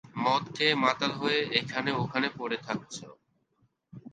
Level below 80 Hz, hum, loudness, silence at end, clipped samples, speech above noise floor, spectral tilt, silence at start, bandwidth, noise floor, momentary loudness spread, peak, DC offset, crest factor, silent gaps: -70 dBFS; none; -28 LUFS; 0.05 s; under 0.1%; 42 dB; -4.5 dB/octave; 0.05 s; 9.4 kHz; -72 dBFS; 11 LU; -8 dBFS; under 0.1%; 22 dB; none